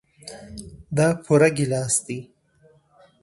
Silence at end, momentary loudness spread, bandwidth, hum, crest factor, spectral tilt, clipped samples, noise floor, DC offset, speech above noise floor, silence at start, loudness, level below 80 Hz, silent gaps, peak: 1 s; 22 LU; 12 kHz; none; 20 dB; -5 dB/octave; under 0.1%; -58 dBFS; under 0.1%; 38 dB; 0.25 s; -21 LUFS; -54 dBFS; none; -4 dBFS